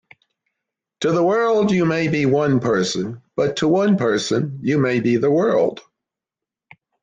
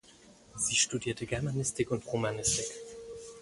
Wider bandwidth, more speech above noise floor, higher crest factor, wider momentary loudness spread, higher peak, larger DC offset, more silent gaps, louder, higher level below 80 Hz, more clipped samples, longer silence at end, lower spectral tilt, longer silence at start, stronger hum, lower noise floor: second, 9.6 kHz vs 11.5 kHz; first, 69 dB vs 25 dB; second, 12 dB vs 20 dB; second, 6 LU vs 18 LU; first, -6 dBFS vs -14 dBFS; neither; neither; first, -19 LUFS vs -31 LUFS; about the same, -58 dBFS vs -56 dBFS; neither; first, 1.2 s vs 0 s; first, -6 dB/octave vs -3 dB/octave; first, 1 s vs 0.05 s; neither; first, -87 dBFS vs -58 dBFS